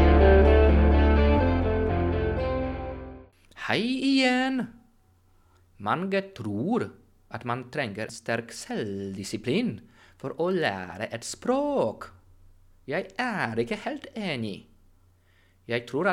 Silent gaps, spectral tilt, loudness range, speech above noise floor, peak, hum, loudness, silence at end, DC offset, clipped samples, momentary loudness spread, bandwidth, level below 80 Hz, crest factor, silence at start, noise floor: none; -6.5 dB/octave; 7 LU; 33 dB; -6 dBFS; none; -26 LUFS; 0 s; under 0.1%; under 0.1%; 17 LU; 11 kHz; -30 dBFS; 20 dB; 0 s; -61 dBFS